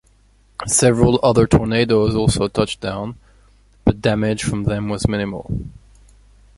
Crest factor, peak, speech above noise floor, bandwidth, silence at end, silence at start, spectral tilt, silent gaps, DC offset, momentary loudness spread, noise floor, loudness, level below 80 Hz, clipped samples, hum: 18 dB; -2 dBFS; 37 dB; 11.5 kHz; 0.85 s; 0.6 s; -5 dB/octave; none; under 0.1%; 14 LU; -54 dBFS; -18 LUFS; -34 dBFS; under 0.1%; none